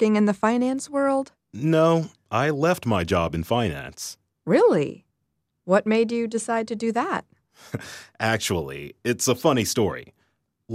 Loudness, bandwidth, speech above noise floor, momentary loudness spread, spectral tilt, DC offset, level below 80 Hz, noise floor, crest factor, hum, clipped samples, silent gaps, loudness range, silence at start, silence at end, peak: -23 LUFS; 15.5 kHz; 53 dB; 15 LU; -5 dB/octave; under 0.1%; -52 dBFS; -76 dBFS; 18 dB; none; under 0.1%; none; 3 LU; 0 s; 0 s; -6 dBFS